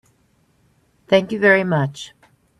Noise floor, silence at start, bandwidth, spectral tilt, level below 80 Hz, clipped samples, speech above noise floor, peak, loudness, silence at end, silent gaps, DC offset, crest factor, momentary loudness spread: -61 dBFS; 1.1 s; 12 kHz; -6 dB/octave; -60 dBFS; under 0.1%; 44 dB; 0 dBFS; -17 LUFS; 0.5 s; none; under 0.1%; 20 dB; 19 LU